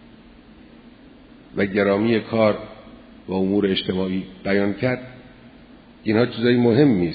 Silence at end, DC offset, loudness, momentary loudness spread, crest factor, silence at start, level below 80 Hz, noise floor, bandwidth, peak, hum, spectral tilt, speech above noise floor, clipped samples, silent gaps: 0 s; under 0.1%; -21 LUFS; 14 LU; 18 dB; 1.55 s; -54 dBFS; -47 dBFS; 5 kHz; -2 dBFS; none; -10.5 dB/octave; 27 dB; under 0.1%; none